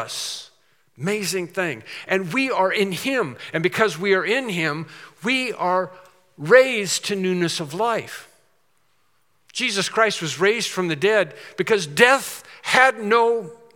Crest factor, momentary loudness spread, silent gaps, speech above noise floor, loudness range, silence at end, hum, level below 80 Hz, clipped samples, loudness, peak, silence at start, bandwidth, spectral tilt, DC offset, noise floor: 22 dB; 14 LU; none; 46 dB; 5 LU; 0.2 s; none; -76 dBFS; under 0.1%; -20 LUFS; 0 dBFS; 0 s; 18 kHz; -3.5 dB/octave; under 0.1%; -67 dBFS